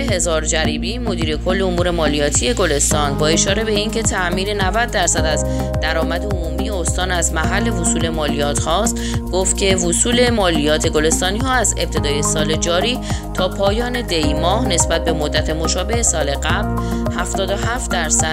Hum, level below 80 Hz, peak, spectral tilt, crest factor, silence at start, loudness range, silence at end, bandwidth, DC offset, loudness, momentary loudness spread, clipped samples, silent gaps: none; -24 dBFS; -2 dBFS; -3.5 dB/octave; 16 dB; 0 s; 2 LU; 0 s; 16 kHz; under 0.1%; -17 LUFS; 5 LU; under 0.1%; none